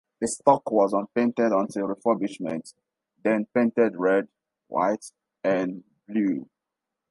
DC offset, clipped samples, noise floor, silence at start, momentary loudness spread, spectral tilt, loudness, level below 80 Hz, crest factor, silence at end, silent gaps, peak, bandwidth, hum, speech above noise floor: under 0.1%; under 0.1%; -86 dBFS; 0.2 s; 11 LU; -6 dB/octave; -25 LUFS; -72 dBFS; 22 dB; 0.65 s; none; -4 dBFS; 11.5 kHz; none; 62 dB